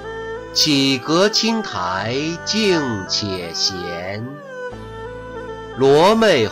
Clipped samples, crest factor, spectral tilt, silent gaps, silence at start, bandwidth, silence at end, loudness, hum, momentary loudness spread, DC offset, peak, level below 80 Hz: under 0.1%; 14 dB; -3.5 dB/octave; none; 0 s; 16 kHz; 0 s; -17 LUFS; none; 18 LU; under 0.1%; -4 dBFS; -48 dBFS